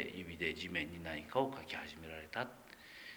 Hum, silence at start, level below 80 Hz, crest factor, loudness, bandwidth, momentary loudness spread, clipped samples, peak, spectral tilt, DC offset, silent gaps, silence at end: none; 0 s; -66 dBFS; 22 dB; -42 LUFS; over 20 kHz; 12 LU; under 0.1%; -20 dBFS; -5 dB/octave; under 0.1%; none; 0 s